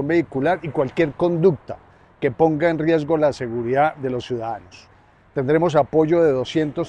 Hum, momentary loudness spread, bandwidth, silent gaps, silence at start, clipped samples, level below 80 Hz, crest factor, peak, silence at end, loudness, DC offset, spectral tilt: none; 10 LU; 9.2 kHz; none; 0 s; under 0.1%; -52 dBFS; 16 dB; -4 dBFS; 0 s; -20 LUFS; under 0.1%; -7.5 dB/octave